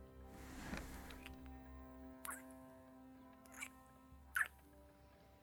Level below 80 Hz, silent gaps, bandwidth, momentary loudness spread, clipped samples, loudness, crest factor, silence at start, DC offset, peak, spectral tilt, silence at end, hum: -62 dBFS; none; over 20 kHz; 22 LU; under 0.1%; -50 LUFS; 26 dB; 0 s; under 0.1%; -26 dBFS; -3.5 dB/octave; 0 s; none